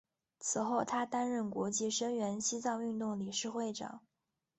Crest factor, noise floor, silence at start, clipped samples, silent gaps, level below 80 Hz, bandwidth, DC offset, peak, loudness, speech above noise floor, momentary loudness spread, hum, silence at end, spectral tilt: 18 dB; -88 dBFS; 0.4 s; under 0.1%; none; -78 dBFS; 8.4 kHz; under 0.1%; -20 dBFS; -36 LUFS; 51 dB; 7 LU; none; 0.6 s; -3.5 dB/octave